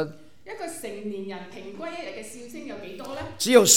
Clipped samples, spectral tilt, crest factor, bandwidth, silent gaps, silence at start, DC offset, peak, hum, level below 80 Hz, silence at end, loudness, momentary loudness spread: under 0.1%; -2 dB/octave; 26 dB; 17.5 kHz; none; 0 s; 0.5%; 0 dBFS; none; -60 dBFS; 0 s; -29 LUFS; 14 LU